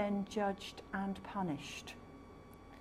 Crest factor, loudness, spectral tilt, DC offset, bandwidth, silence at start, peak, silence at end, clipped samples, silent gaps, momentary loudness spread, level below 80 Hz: 16 dB; -41 LUFS; -5.5 dB/octave; under 0.1%; 14.5 kHz; 0 s; -26 dBFS; 0 s; under 0.1%; none; 19 LU; -64 dBFS